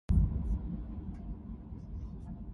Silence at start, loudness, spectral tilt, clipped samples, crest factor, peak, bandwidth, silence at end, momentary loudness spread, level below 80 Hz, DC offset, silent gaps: 0.1 s; -38 LUFS; -10.5 dB/octave; under 0.1%; 18 dB; -16 dBFS; 3.5 kHz; 0 s; 15 LU; -36 dBFS; under 0.1%; none